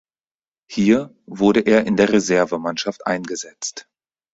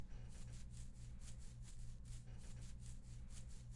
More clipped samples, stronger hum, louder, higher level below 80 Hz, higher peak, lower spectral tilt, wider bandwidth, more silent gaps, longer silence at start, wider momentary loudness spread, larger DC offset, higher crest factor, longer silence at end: neither; second, none vs 60 Hz at -60 dBFS; first, -19 LUFS vs -57 LUFS; about the same, -56 dBFS vs -54 dBFS; first, -2 dBFS vs -40 dBFS; about the same, -5 dB/octave vs -5 dB/octave; second, 8 kHz vs 11.5 kHz; neither; first, 0.7 s vs 0 s; first, 13 LU vs 1 LU; neither; first, 18 dB vs 12 dB; first, 0.55 s vs 0 s